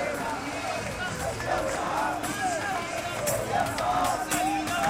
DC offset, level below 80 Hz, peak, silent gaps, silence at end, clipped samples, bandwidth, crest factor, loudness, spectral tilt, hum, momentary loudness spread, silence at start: under 0.1%; -48 dBFS; -14 dBFS; none; 0 s; under 0.1%; 16.5 kHz; 16 dB; -28 LUFS; -3.5 dB/octave; none; 5 LU; 0 s